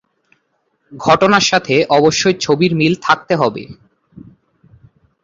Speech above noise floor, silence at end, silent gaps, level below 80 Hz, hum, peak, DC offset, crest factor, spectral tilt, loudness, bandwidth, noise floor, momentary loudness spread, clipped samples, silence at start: 52 dB; 1.5 s; none; -52 dBFS; none; 0 dBFS; under 0.1%; 16 dB; -4.5 dB/octave; -13 LUFS; 7.8 kHz; -65 dBFS; 6 LU; under 0.1%; 0.9 s